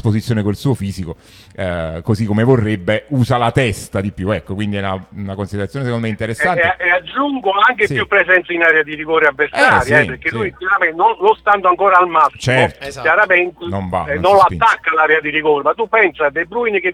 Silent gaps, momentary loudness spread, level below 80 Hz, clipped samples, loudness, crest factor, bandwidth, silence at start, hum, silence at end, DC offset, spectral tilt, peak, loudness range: none; 10 LU; -44 dBFS; under 0.1%; -14 LUFS; 14 dB; 15.5 kHz; 0.05 s; none; 0 s; under 0.1%; -6 dB/octave; 0 dBFS; 5 LU